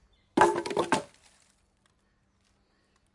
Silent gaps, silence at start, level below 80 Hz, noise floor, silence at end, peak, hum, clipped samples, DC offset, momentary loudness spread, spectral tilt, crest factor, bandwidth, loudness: none; 0.35 s; -66 dBFS; -70 dBFS; 2.1 s; -6 dBFS; none; under 0.1%; under 0.1%; 9 LU; -4 dB/octave; 26 dB; 11.5 kHz; -27 LUFS